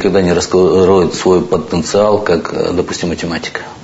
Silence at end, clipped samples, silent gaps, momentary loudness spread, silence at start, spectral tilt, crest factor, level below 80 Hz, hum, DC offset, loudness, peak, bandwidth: 0 s; under 0.1%; none; 9 LU; 0 s; -5.5 dB/octave; 12 dB; -40 dBFS; none; under 0.1%; -13 LUFS; 0 dBFS; 8 kHz